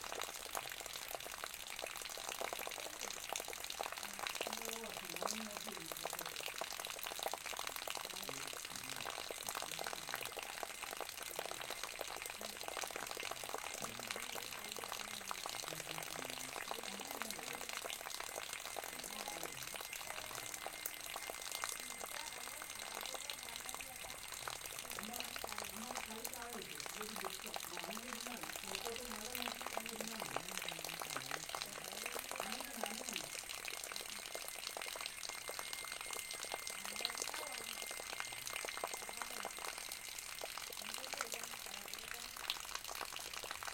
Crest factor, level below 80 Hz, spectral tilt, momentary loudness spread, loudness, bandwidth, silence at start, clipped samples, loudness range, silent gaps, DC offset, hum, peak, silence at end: 28 dB; -70 dBFS; -0.5 dB/octave; 3 LU; -44 LUFS; 17 kHz; 0 s; under 0.1%; 2 LU; none; under 0.1%; none; -18 dBFS; 0 s